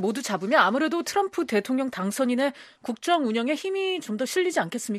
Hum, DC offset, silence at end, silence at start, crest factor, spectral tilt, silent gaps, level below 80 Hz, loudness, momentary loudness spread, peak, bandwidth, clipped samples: none; under 0.1%; 0 s; 0 s; 20 dB; -4 dB/octave; none; -74 dBFS; -25 LUFS; 7 LU; -4 dBFS; 14.5 kHz; under 0.1%